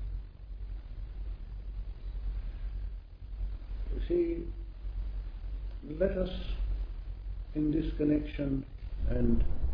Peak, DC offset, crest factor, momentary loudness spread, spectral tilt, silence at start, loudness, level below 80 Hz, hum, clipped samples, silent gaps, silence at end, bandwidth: -16 dBFS; under 0.1%; 18 dB; 14 LU; -10.5 dB/octave; 0 s; -36 LUFS; -36 dBFS; none; under 0.1%; none; 0 s; 5.2 kHz